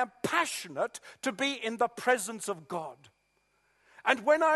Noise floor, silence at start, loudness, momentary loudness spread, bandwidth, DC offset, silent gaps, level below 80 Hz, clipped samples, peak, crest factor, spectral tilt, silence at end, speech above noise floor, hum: -73 dBFS; 0 s; -31 LUFS; 10 LU; 12.5 kHz; under 0.1%; none; -80 dBFS; under 0.1%; -8 dBFS; 24 dB; -2.5 dB/octave; 0 s; 43 dB; none